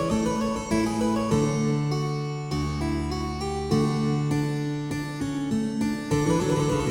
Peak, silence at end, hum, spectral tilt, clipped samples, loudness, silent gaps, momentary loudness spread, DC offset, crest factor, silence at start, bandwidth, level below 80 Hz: -10 dBFS; 0 s; none; -6.5 dB/octave; under 0.1%; -26 LUFS; none; 6 LU; under 0.1%; 14 dB; 0 s; 16.5 kHz; -40 dBFS